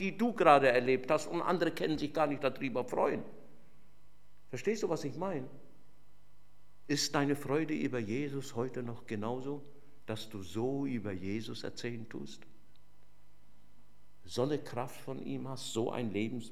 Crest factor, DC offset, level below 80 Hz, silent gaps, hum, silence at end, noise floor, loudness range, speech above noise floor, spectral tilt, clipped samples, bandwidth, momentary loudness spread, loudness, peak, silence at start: 26 dB; 0.6%; -70 dBFS; none; 50 Hz at -65 dBFS; 0 s; -65 dBFS; 9 LU; 31 dB; -5 dB/octave; under 0.1%; 16 kHz; 12 LU; -34 LUFS; -8 dBFS; 0 s